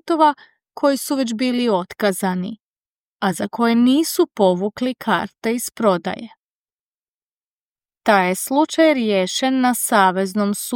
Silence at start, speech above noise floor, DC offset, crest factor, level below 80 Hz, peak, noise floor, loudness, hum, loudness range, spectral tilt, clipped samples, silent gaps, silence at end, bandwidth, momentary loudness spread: 0.05 s; over 72 dB; under 0.1%; 18 dB; -66 dBFS; -2 dBFS; under -90 dBFS; -18 LUFS; none; 5 LU; -4.5 dB/octave; under 0.1%; 2.61-3.19 s, 6.39-6.65 s, 6.74-7.76 s; 0 s; 17 kHz; 8 LU